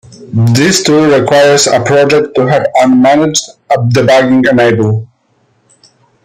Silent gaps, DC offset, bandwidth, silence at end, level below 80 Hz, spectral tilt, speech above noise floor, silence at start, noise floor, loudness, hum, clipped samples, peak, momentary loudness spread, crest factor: none; under 0.1%; 15.5 kHz; 1.2 s; -48 dBFS; -5 dB/octave; 46 dB; 0.1 s; -54 dBFS; -8 LUFS; none; under 0.1%; 0 dBFS; 6 LU; 8 dB